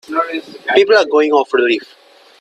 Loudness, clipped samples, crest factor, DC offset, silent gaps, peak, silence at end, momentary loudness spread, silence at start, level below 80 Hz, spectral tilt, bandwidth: -14 LUFS; under 0.1%; 14 dB; under 0.1%; none; 0 dBFS; 0.55 s; 10 LU; 0.1 s; -64 dBFS; -3 dB/octave; 9.2 kHz